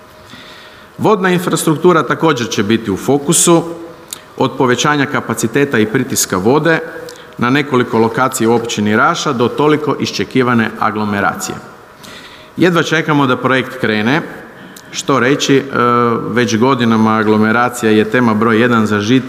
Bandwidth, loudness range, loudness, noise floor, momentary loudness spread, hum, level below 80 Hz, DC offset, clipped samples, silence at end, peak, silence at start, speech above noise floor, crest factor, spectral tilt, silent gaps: 15.5 kHz; 3 LU; -13 LUFS; -36 dBFS; 15 LU; none; -54 dBFS; under 0.1%; under 0.1%; 0 s; 0 dBFS; 0.2 s; 24 dB; 14 dB; -4.5 dB/octave; none